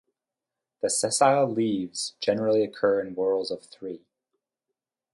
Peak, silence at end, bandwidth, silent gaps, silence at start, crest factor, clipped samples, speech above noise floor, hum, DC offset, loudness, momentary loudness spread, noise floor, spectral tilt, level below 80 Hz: -8 dBFS; 1.15 s; 11.5 kHz; none; 0.85 s; 20 dB; under 0.1%; 63 dB; none; under 0.1%; -25 LUFS; 17 LU; -88 dBFS; -3.5 dB/octave; -70 dBFS